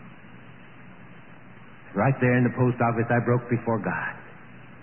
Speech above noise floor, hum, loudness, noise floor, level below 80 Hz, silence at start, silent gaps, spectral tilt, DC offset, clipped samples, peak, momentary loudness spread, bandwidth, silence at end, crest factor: 25 dB; none; -24 LUFS; -48 dBFS; -60 dBFS; 0 s; none; -12.5 dB/octave; 0.4%; under 0.1%; -10 dBFS; 22 LU; 3.2 kHz; 0.05 s; 16 dB